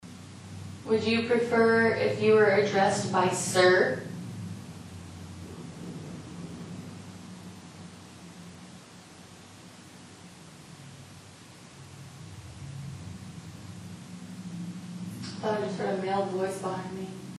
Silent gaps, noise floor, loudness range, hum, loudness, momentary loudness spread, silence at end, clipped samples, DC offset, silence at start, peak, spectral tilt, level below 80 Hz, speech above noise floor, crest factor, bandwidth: none; -50 dBFS; 24 LU; none; -26 LUFS; 25 LU; 0 s; under 0.1%; under 0.1%; 0.05 s; -10 dBFS; -5 dB/octave; -64 dBFS; 26 dB; 20 dB; 12.5 kHz